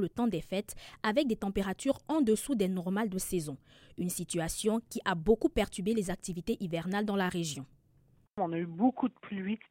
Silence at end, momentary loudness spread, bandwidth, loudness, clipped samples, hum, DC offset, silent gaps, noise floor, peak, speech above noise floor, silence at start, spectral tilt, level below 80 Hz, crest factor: 0.15 s; 9 LU; 16.5 kHz; -33 LUFS; under 0.1%; none; under 0.1%; none; -66 dBFS; -14 dBFS; 34 dB; 0 s; -5 dB/octave; -52 dBFS; 18 dB